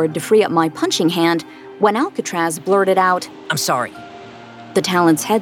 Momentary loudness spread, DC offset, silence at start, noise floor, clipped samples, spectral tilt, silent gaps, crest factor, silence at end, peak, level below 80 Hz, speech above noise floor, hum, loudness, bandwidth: 21 LU; under 0.1%; 0 s; -37 dBFS; under 0.1%; -4 dB/octave; none; 16 dB; 0 s; -2 dBFS; -66 dBFS; 20 dB; none; -17 LUFS; 19 kHz